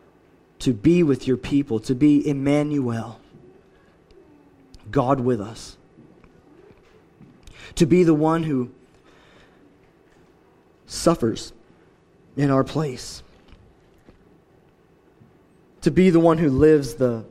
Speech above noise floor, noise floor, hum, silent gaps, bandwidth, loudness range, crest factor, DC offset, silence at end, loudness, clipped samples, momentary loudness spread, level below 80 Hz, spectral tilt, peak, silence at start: 37 dB; -56 dBFS; none; none; 13 kHz; 7 LU; 20 dB; under 0.1%; 0.05 s; -20 LUFS; under 0.1%; 18 LU; -48 dBFS; -7 dB/octave; -4 dBFS; 0.6 s